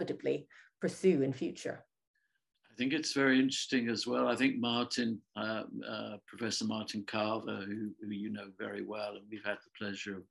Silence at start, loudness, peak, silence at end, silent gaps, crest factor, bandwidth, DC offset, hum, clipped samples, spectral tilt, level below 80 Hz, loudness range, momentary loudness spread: 0 s; -35 LUFS; -16 dBFS; 0.05 s; 2.07-2.14 s; 20 dB; 12 kHz; under 0.1%; none; under 0.1%; -4.5 dB/octave; -82 dBFS; 6 LU; 12 LU